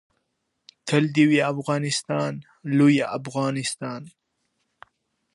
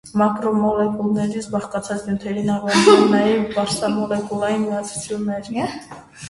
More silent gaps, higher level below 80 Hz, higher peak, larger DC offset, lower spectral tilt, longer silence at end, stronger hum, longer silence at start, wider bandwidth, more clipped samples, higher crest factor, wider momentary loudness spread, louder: neither; second, -72 dBFS vs -52 dBFS; second, -4 dBFS vs 0 dBFS; neither; about the same, -5.5 dB/octave vs -5 dB/octave; first, 1.25 s vs 0 s; neither; first, 0.85 s vs 0.05 s; about the same, 11.5 kHz vs 11.5 kHz; neither; about the same, 20 dB vs 20 dB; about the same, 15 LU vs 13 LU; second, -23 LUFS vs -19 LUFS